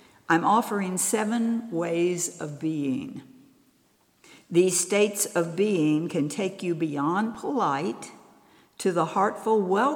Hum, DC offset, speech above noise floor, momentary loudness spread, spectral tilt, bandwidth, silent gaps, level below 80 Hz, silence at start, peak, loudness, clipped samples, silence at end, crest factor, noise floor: none; under 0.1%; 39 dB; 8 LU; -4.5 dB/octave; 19.5 kHz; none; -76 dBFS; 0.3 s; -8 dBFS; -25 LUFS; under 0.1%; 0 s; 18 dB; -65 dBFS